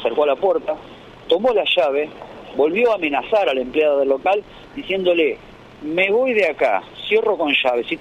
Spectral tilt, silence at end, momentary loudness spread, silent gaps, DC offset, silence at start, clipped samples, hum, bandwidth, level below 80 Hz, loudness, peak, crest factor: -5 dB/octave; 0 s; 13 LU; none; under 0.1%; 0 s; under 0.1%; none; 9.2 kHz; -54 dBFS; -18 LUFS; -4 dBFS; 16 dB